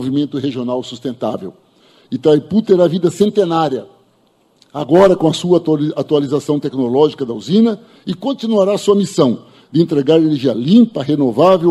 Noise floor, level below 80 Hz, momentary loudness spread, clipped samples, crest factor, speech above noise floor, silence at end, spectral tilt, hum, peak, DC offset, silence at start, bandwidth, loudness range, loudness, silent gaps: -56 dBFS; -56 dBFS; 12 LU; under 0.1%; 14 dB; 42 dB; 0 s; -7 dB/octave; none; 0 dBFS; under 0.1%; 0 s; 12.5 kHz; 2 LU; -14 LUFS; none